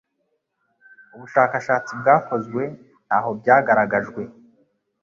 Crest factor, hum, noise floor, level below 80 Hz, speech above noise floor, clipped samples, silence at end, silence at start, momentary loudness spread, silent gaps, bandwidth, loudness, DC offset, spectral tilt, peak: 20 dB; none; -73 dBFS; -64 dBFS; 53 dB; under 0.1%; 0.7 s; 1.15 s; 14 LU; none; 7.4 kHz; -20 LUFS; under 0.1%; -7 dB/octave; -2 dBFS